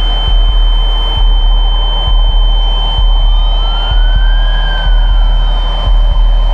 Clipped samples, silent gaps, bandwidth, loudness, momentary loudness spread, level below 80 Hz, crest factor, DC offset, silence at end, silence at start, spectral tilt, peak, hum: under 0.1%; none; 4.2 kHz; -13 LUFS; 2 LU; -8 dBFS; 8 dB; under 0.1%; 0 s; 0 s; -6 dB/octave; 0 dBFS; none